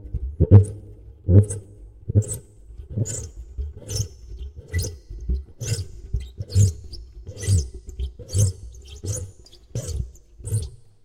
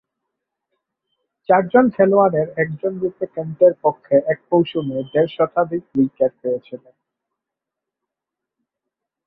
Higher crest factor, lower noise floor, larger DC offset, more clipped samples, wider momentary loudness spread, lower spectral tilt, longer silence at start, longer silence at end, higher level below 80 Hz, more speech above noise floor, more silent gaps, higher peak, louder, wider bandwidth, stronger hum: first, 24 dB vs 18 dB; second, -45 dBFS vs -85 dBFS; neither; neither; first, 22 LU vs 11 LU; second, -6 dB/octave vs -11 dB/octave; second, 0 s vs 1.5 s; second, 0.3 s vs 2.5 s; first, -34 dBFS vs -62 dBFS; second, 28 dB vs 67 dB; neither; about the same, 0 dBFS vs -2 dBFS; second, -24 LUFS vs -18 LUFS; first, 16 kHz vs 4 kHz; neither